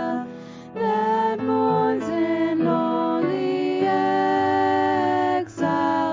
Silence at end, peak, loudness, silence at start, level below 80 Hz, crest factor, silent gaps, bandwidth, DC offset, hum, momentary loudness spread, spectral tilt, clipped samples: 0 s; -10 dBFS; -22 LUFS; 0 s; -60 dBFS; 12 dB; none; 7.6 kHz; under 0.1%; none; 5 LU; -7 dB/octave; under 0.1%